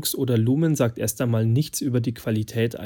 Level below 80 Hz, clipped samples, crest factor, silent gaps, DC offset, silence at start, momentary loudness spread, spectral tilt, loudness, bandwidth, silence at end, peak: -56 dBFS; under 0.1%; 16 dB; none; under 0.1%; 0 s; 5 LU; -6 dB/octave; -23 LUFS; 17.5 kHz; 0 s; -8 dBFS